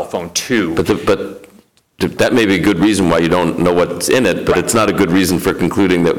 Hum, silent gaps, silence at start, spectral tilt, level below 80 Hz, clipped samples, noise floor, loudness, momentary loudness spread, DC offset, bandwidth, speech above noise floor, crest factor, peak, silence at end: none; none; 0 s; -5 dB/octave; -40 dBFS; under 0.1%; -48 dBFS; -14 LUFS; 6 LU; 0.5%; 19 kHz; 35 dB; 10 dB; -4 dBFS; 0 s